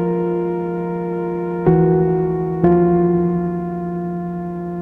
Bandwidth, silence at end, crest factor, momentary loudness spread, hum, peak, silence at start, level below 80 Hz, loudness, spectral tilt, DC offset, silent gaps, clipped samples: 3 kHz; 0 s; 16 dB; 10 LU; none; -2 dBFS; 0 s; -42 dBFS; -18 LUFS; -12 dB/octave; under 0.1%; none; under 0.1%